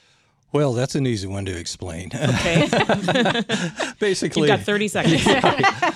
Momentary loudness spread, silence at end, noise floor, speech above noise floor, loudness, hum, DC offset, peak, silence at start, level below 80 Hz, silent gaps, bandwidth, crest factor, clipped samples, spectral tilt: 11 LU; 0 s; -60 dBFS; 40 dB; -20 LUFS; none; under 0.1%; -2 dBFS; 0.55 s; -48 dBFS; none; 14 kHz; 18 dB; under 0.1%; -5 dB/octave